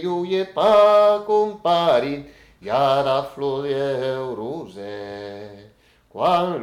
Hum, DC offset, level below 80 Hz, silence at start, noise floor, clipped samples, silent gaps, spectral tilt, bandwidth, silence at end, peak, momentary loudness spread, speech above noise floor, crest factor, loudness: none; under 0.1%; -58 dBFS; 0 s; -53 dBFS; under 0.1%; none; -6 dB/octave; 12 kHz; 0 s; -6 dBFS; 19 LU; 33 dB; 14 dB; -19 LUFS